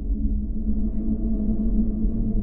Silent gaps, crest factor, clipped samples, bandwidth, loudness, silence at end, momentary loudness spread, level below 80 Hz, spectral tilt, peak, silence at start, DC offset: none; 12 dB; under 0.1%; 1.3 kHz; -26 LUFS; 0 s; 3 LU; -24 dBFS; -15 dB/octave; -10 dBFS; 0 s; under 0.1%